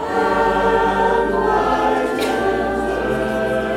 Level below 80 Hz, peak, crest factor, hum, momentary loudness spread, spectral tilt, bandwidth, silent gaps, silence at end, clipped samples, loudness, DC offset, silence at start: -36 dBFS; -4 dBFS; 12 dB; none; 4 LU; -5.5 dB/octave; 16.5 kHz; none; 0 s; under 0.1%; -18 LUFS; under 0.1%; 0 s